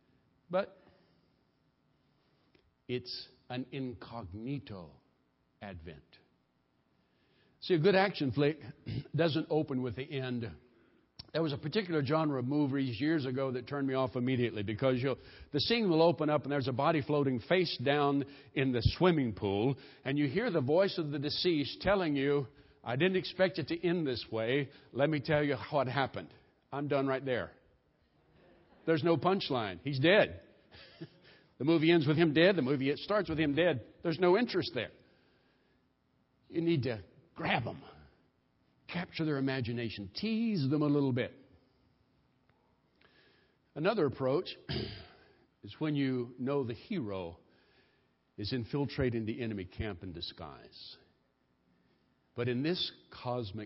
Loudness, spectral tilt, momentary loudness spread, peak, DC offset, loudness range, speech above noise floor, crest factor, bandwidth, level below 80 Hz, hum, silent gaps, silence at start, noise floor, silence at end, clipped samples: -33 LUFS; -5 dB/octave; 15 LU; -12 dBFS; under 0.1%; 12 LU; 43 dB; 22 dB; 5.8 kHz; -60 dBFS; none; none; 0.5 s; -75 dBFS; 0 s; under 0.1%